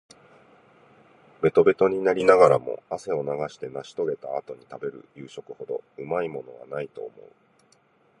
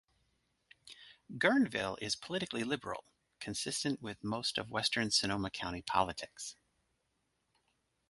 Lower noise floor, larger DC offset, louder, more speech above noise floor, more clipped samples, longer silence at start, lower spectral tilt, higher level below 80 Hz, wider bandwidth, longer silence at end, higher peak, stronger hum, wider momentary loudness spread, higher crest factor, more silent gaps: second, -62 dBFS vs -81 dBFS; neither; first, -24 LUFS vs -35 LUFS; second, 38 dB vs 45 dB; neither; first, 1.4 s vs 0.85 s; first, -6.5 dB/octave vs -3 dB/octave; about the same, -64 dBFS vs -64 dBFS; about the same, 10.5 kHz vs 11.5 kHz; second, 1.1 s vs 1.55 s; first, -2 dBFS vs -12 dBFS; neither; first, 21 LU vs 16 LU; about the same, 24 dB vs 24 dB; neither